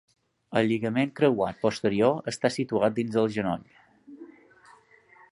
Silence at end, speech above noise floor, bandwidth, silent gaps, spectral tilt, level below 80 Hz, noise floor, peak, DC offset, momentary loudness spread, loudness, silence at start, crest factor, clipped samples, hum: 1.05 s; 31 dB; 11.5 kHz; none; -6 dB/octave; -62 dBFS; -57 dBFS; -8 dBFS; under 0.1%; 6 LU; -26 LUFS; 0.5 s; 20 dB; under 0.1%; none